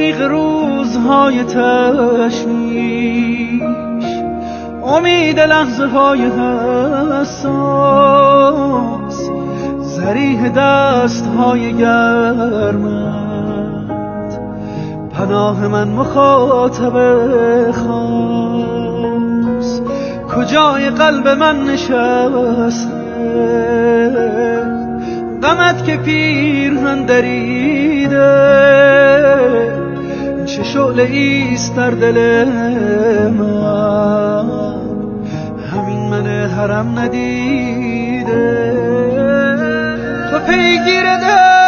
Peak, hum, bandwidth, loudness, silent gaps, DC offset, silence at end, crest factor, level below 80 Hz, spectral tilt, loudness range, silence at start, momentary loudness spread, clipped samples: 0 dBFS; none; 7 kHz; -13 LUFS; none; under 0.1%; 0 s; 12 dB; -40 dBFS; -4.5 dB/octave; 6 LU; 0 s; 11 LU; under 0.1%